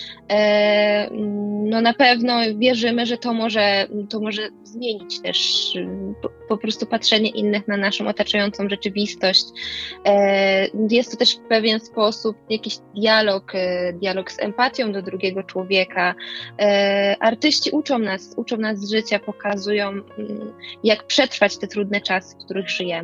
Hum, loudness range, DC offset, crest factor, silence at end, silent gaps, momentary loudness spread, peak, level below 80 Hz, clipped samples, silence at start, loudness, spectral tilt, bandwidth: none; 4 LU; under 0.1%; 20 dB; 0 s; none; 11 LU; -2 dBFS; -60 dBFS; under 0.1%; 0 s; -20 LUFS; -4 dB/octave; 8.4 kHz